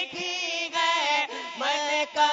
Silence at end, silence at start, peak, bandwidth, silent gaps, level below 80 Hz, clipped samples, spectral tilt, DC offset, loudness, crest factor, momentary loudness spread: 0 s; 0 s; -10 dBFS; 7.8 kHz; none; -82 dBFS; under 0.1%; 0 dB/octave; under 0.1%; -26 LUFS; 16 dB; 6 LU